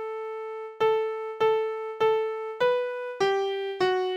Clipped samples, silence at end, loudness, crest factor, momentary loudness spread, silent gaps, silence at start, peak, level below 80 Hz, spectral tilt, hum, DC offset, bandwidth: under 0.1%; 0 s; -27 LUFS; 14 dB; 9 LU; none; 0 s; -12 dBFS; -72 dBFS; -4.5 dB/octave; none; under 0.1%; 8.8 kHz